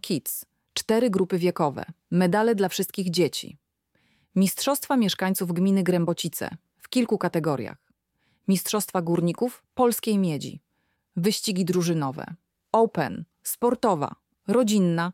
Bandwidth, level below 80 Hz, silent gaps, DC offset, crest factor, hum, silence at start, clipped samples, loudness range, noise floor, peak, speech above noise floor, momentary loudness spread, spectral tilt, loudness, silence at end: 17 kHz; -68 dBFS; none; under 0.1%; 18 dB; none; 0.05 s; under 0.1%; 2 LU; -73 dBFS; -8 dBFS; 49 dB; 11 LU; -5.5 dB/octave; -25 LUFS; 0 s